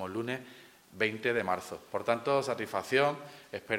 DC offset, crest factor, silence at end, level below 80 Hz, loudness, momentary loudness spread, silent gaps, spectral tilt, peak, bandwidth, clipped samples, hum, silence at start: under 0.1%; 22 dB; 0 s; -74 dBFS; -32 LUFS; 15 LU; none; -4.5 dB/octave; -12 dBFS; 16.5 kHz; under 0.1%; none; 0 s